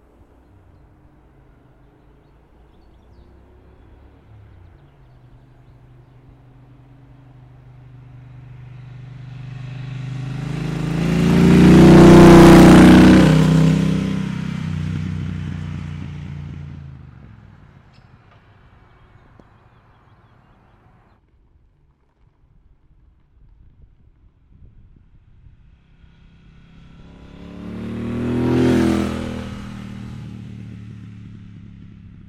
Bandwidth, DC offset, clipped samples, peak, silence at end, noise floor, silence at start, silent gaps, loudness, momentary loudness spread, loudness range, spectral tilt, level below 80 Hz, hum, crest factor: 14.5 kHz; under 0.1%; under 0.1%; -2 dBFS; 1.25 s; -58 dBFS; 9 s; none; -12 LUFS; 30 LU; 25 LU; -7 dB/octave; -36 dBFS; none; 16 dB